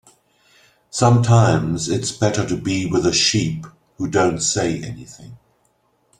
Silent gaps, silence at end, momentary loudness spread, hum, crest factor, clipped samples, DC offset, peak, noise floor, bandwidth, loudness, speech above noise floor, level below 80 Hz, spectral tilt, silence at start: none; 0.85 s; 15 LU; none; 18 dB; under 0.1%; under 0.1%; -2 dBFS; -63 dBFS; 11 kHz; -18 LUFS; 45 dB; -48 dBFS; -4.5 dB/octave; 0.95 s